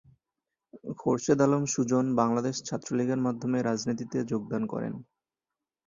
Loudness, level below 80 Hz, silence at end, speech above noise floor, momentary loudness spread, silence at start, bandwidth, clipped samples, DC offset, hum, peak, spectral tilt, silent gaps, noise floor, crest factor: -28 LUFS; -68 dBFS; 0.85 s; 62 dB; 10 LU; 0.75 s; 7.6 kHz; under 0.1%; under 0.1%; none; -10 dBFS; -6 dB/octave; none; -90 dBFS; 20 dB